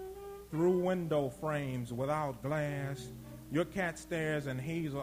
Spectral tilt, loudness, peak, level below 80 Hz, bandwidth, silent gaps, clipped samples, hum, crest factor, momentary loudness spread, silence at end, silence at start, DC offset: -6.5 dB/octave; -35 LUFS; -20 dBFS; -60 dBFS; 16.5 kHz; none; under 0.1%; none; 16 dB; 11 LU; 0 s; 0 s; under 0.1%